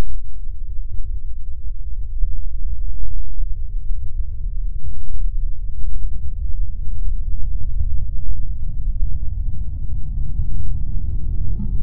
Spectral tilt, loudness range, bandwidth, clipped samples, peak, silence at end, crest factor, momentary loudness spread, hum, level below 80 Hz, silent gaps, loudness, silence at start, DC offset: -13.5 dB/octave; 3 LU; 0.5 kHz; under 0.1%; -2 dBFS; 0 s; 8 dB; 6 LU; none; -22 dBFS; none; -29 LUFS; 0 s; under 0.1%